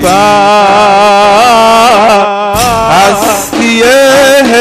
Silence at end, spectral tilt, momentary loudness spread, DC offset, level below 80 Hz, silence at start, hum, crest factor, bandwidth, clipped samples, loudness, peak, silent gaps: 0 s; -3 dB/octave; 5 LU; under 0.1%; -32 dBFS; 0 s; none; 4 dB; 16 kHz; 0.4%; -5 LUFS; 0 dBFS; none